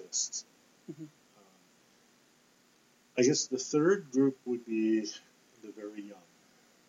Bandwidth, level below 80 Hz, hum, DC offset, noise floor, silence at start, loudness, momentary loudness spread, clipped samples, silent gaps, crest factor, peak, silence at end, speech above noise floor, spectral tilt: 8 kHz; -90 dBFS; none; under 0.1%; -66 dBFS; 0 s; -31 LUFS; 23 LU; under 0.1%; none; 20 dB; -16 dBFS; 0.75 s; 35 dB; -4 dB/octave